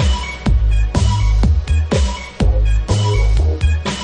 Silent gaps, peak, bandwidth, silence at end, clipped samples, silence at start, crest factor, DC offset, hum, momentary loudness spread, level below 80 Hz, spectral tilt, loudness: none; -2 dBFS; 9.6 kHz; 0 s; under 0.1%; 0 s; 12 dB; under 0.1%; none; 3 LU; -16 dBFS; -6 dB/octave; -17 LUFS